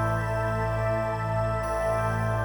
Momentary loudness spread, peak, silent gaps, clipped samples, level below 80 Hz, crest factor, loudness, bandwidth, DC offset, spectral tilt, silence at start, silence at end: 1 LU; -16 dBFS; none; under 0.1%; -38 dBFS; 12 dB; -27 LUFS; over 20 kHz; under 0.1%; -7 dB/octave; 0 s; 0 s